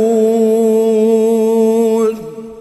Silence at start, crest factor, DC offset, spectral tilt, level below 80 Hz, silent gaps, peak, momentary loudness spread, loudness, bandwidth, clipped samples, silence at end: 0 s; 10 dB; under 0.1%; -6.5 dB/octave; -58 dBFS; none; -2 dBFS; 6 LU; -12 LUFS; 13.5 kHz; under 0.1%; 0 s